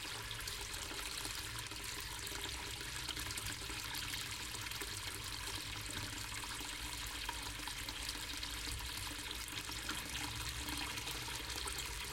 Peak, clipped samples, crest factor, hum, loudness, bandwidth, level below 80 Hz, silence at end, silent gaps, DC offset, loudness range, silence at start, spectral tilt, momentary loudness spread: -24 dBFS; under 0.1%; 20 dB; none; -42 LUFS; 17 kHz; -54 dBFS; 0 s; none; under 0.1%; 1 LU; 0 s; -1.5 dB/octave; 2 LU